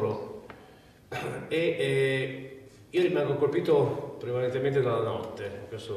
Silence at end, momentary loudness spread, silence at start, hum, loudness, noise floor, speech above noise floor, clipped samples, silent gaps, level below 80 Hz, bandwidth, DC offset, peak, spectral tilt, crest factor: 0 s; 16 LU; 0 s; none; -28 LUFS; -54 dBFS; 26 dB; under 0.1%; none; -64 dBFS; 13.5 kHz; under 0.1%; -14 dBFS; -7 dB/octave; 16 dB